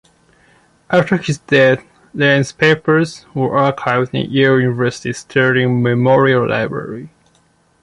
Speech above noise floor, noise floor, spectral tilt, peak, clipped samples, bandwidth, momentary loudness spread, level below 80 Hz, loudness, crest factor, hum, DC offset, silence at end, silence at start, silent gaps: 42 dB; -56 dBFS; -6 dB/octave; 0 dBFS; under 0.1%; 11.5 kHz; 9 LU; -54 dBFS; -15 LUFS; 14 dB; none; under 0.1%; 0.75 s; 0.9 s; none